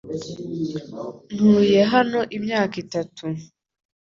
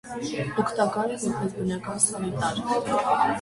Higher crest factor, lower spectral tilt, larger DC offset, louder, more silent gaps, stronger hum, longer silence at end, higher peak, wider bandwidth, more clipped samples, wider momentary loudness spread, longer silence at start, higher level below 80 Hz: about the same, 18 dB vs 18 dB; first, -6.5 dB/octave vs -4 dB/octave; neither; first, -21 LUFS vs -26 LUFS; neither; neither; first, 0.7 s vs 0 s; first, -4 dBFS vs -8 dBFS; second, 7.4 kHz vs 11.5 kHz; neither; first, 16 LU vs 6 LU; about the same, 0.05 s vs 0.05 s; about the same, -60 dBFS vs -56 dBFS